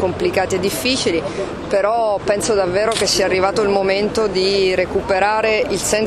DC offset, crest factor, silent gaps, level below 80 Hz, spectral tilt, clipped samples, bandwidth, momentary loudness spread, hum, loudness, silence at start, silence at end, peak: under 0.1%; 16 dB; none; -42 dBFS; -3.5 dB/octave; under 0.1%; 14.5 kHz; 3 LU; none; -17 LUFS; 0 s; 0 s; -2 dBFS